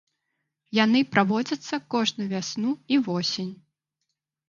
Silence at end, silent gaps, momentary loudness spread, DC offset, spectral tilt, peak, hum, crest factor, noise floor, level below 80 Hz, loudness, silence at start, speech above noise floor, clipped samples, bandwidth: 0.95 s; none; 9 LU; under 0.1%; -4.5 dB/octave; -4 dBFS; none; 22 dB; -81 dBFS; -72 dBFS; -25 LUFS; 0.7 s; 57 dB; under 0.1%; 7.4 kHz